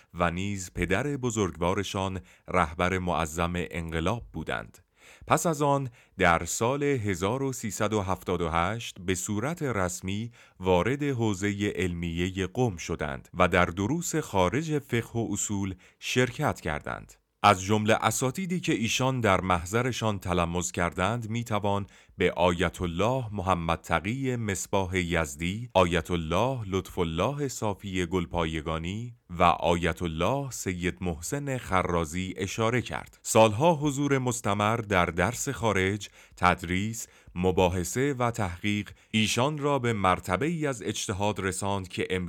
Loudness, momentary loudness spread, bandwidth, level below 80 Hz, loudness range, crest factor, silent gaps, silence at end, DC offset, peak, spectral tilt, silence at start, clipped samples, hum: -28 LUFS; 8 LU; 18 kHz; -52 dBFS; 3 LU; 22 dB; none; 0 s; under 0.1%; -4 dBFS; -5 dB/octave; 0.15 s; under 0.1%; none